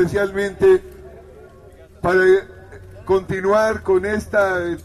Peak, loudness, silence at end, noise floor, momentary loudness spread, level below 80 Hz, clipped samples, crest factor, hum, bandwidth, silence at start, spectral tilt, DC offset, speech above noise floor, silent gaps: -4 dBFS; -18 LUFS; 0 s; -44 dBFS; 7 LU; -44 dBFS; under 0.1%; 14 dB; none; 12.5 kHz; 0 s; -6.5 dB/octave; under 0.1%; 27 dB; none